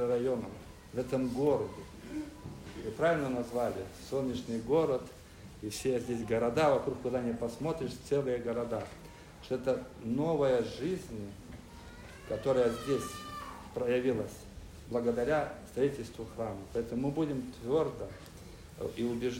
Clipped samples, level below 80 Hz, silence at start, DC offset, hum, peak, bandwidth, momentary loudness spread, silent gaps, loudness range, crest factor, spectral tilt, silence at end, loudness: under 0.1%; -56 dBFS; 0 s; under 0.1%; none; -16 dBFS; 16 kHz; 19 LU; none; 3 LU; 18 dB; -6 dB/octave; 0 s; -34 LUFS